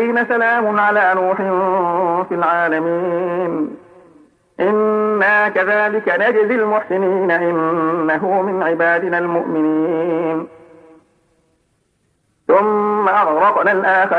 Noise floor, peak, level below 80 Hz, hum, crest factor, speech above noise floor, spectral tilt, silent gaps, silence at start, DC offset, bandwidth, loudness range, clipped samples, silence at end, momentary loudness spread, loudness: -63 dBFS; -2 dBFS; -66 dBFS; none; 16 dB; 48 dB; -8 dB/octave; none; 0 s; under 0.1%; 9.6 kHz; 5 LU; under 0.1%; 0 s; 6 LU; -16 LUFS